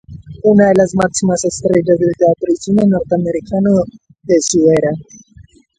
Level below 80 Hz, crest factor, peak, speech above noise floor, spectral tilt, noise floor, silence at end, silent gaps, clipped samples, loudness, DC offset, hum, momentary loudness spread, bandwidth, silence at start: -44 dBFS; 14 dB; 0 dBFS; 31 dB; -6 dB/octave; -44 dBFS; 0.35 s; none; under 0.1%; -13 LUFS; under 0.1%; none; 7 LU; 10.5 kHz; 0.1 s